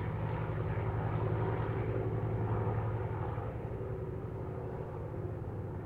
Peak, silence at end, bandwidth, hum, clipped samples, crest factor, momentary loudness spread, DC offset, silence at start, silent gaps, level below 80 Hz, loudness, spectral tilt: -22 dBFS; 0 s; 4.1 kHz; none; under 0.1%; 14 dB; 7 LU; under 0.1%; 0 s; none; -48 dBFS; -37 LUFS; -10 dB/octave